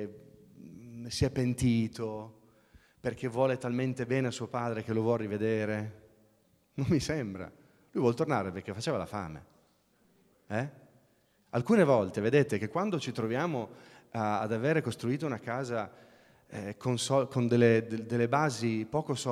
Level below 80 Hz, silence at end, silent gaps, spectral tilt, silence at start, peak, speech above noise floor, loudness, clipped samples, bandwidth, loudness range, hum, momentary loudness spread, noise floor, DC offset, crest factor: -58 dBFS; 0 s; none; -6 dB/octave; 0 s; -10 dBFS; 38 dB; -31 LUFS; under 0.1%; 14.5 kHz; 5 LU; none; 15 LU; -68 dBFS; under 0.1%; 22 dB